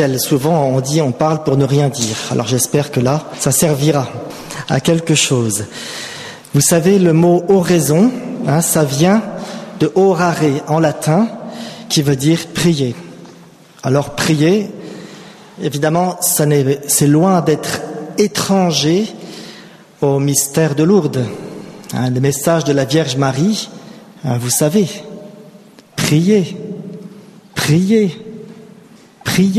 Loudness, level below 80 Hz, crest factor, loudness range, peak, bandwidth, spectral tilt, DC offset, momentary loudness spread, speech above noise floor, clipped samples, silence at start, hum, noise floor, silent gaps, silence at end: -14 LUFS; -50 dBFS; 14 dB; 4 LU; 0 dBFS; 15 kHz; -5 dB/octave; under 0.1%; 16 LU; 28 dB; under 0.1%; 0 s; none; -42 dBFS; none; 0 s